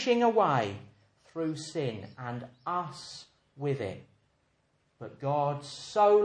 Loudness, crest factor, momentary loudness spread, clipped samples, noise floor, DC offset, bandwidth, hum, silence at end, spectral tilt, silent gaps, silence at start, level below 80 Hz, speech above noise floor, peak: -31 LUFS; 18 dB; 20 LU; under 0.1%; -72 dBFS; under 0.1%; 10 kHz; none; 0 s; -6 dB/octave; none; 0 s; -72 dBFS; 43 dB; -12 dBFS